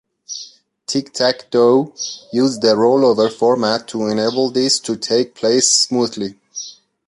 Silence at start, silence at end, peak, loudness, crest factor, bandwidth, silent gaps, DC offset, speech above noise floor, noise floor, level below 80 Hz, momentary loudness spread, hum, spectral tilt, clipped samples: 0.3 s; 0.35 s; 0 dBFS; -16 LUFS; 16 dB; 11.5 kHz; none; under 0.1%; 24 dB; -40 dBFS; -62 dBFS; 17 LU; none; -3 dB/octave; under 0.1%